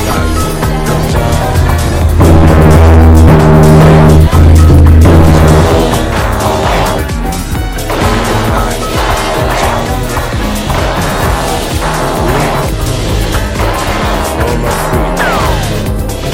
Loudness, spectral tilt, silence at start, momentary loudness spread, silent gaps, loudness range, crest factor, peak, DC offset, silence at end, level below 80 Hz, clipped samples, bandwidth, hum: -9 LUFS; -6 dB/octave; 0 s; 10 LU; none; 8 LU; 8 dB; 0 dBFS; under 0.1%; 0 s; -14 dBFS; 5%; 16.5 kHz; none